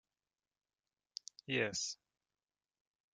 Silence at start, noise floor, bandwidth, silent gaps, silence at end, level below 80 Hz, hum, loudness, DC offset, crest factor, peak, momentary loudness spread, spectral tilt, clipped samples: 1.5 s; under -90 dBFS; 11.5 kHz; none; 1.2 s; -82 dBFS; none; -39 LUFS; under 0.1%; 26 dB; -20 dBFS; 16 LU; -2.5 dB/octave; under 0.1%